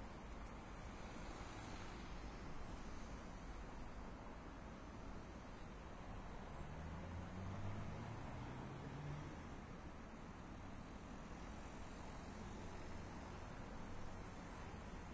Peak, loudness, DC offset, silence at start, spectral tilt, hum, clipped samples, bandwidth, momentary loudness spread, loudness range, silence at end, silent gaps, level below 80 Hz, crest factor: -36 dBFS; -54 LUFS; under 0.1%; 0 s; -6 dB/octave; none; under 0.1%; 8 kHz; 5 LU; 3 LU; 0 s; none; -56 dBFS; 16 dB